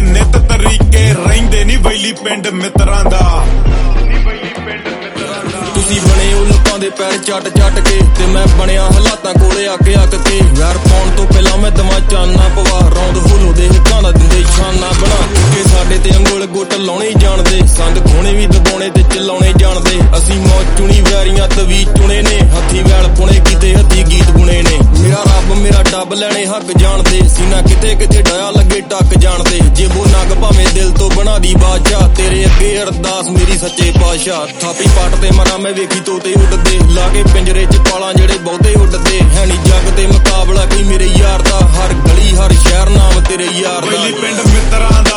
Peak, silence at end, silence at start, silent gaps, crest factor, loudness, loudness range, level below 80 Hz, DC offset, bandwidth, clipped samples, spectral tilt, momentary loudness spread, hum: 0 dBFS; 0 s; 0 s; none; 6 dB; -10 LUFS; 2 LU; -8 dBFS; under 0.1%; 12 kHz; 3%; -4.5 dB/octave; 5 LU; none